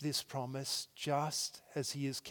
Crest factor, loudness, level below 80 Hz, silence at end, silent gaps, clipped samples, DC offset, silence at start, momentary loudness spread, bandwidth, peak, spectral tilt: 18 dB; -38 LUFS; -82 dBFS; 0 s; none; under 0.1%; under 0.1%; 0 s; 5 LU; 18 kHz; -20 dBFS; -3.5 dB/octave